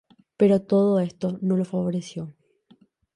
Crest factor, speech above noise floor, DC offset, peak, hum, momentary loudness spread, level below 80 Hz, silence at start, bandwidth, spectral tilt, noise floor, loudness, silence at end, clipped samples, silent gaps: 16 dB; 36 dB; under 0.1%; -8 dBFS; none; 15 LU; -64 dBFS; 0.4 s; 10.5 kHz; -8.5 dB/octave; -59 dBFS; -23 LUFS; 0.85 s; under 0.1%; none